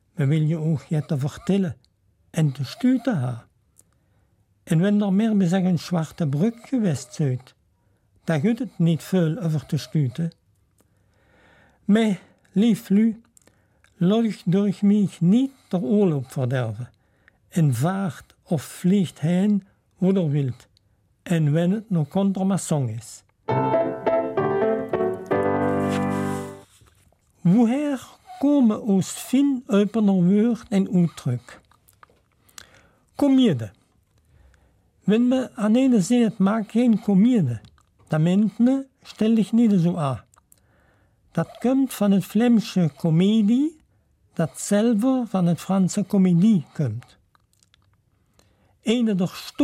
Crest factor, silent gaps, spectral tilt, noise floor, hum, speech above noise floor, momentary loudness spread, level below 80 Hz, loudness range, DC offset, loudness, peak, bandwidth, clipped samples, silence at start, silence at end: 14 dB; none; -7.5 dB/octave; -64 dBFS; none; 44 dB; 10 LU; -62 dBFS; 4 LU; under 0.1%; -22 LUFS; -8 dBFS; 15 kHz; under 0.1%; 0.2 s; 0 s